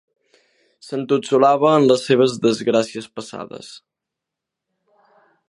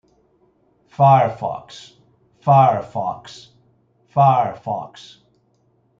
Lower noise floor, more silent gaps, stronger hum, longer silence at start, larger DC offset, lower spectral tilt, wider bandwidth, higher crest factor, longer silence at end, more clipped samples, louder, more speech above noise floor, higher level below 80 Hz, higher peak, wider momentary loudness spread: first, -84 dBFS vs -62 dBFS; neither; neither; second, 0.85 s vs 1 s; neither; second, -5.5 dB/octave vs -8 dB/octave; first, 11.5 kHz vs 7.6 kHz; about the same, 20 dB vs 18 dB; first, 1.7 s vs 1.15 s; neither; about the same, -17 LUFS vs -17 LUFS; first, 66 dB vs 44 dB; second, -68 dBFS vs -62 dBFS; about the same, 0 dBFS vs -2 dBFS; second, 19 LU vs 25 LU